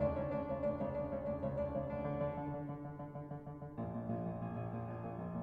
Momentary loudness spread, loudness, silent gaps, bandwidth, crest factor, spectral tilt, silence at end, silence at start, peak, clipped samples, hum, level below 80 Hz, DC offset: 9 LU; -42 LUFS; none; 4.8 kHz; 16 dB; -11 dB/octave; 0 s; 0 s; -24 dBFS; under 0.1%; none; -56 dBFS; under 0.1%